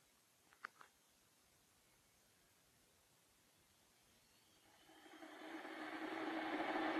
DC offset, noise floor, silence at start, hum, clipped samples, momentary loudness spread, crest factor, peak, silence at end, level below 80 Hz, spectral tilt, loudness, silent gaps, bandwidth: under 0.1%; -75 dBFS; 0.65 s; none; under 0.1%; 24 LU; 22 dB; -30 dBFS; 0 s; -88 dBFS; -3.5 dB/octave; -48 LUFS; none; 13 kHz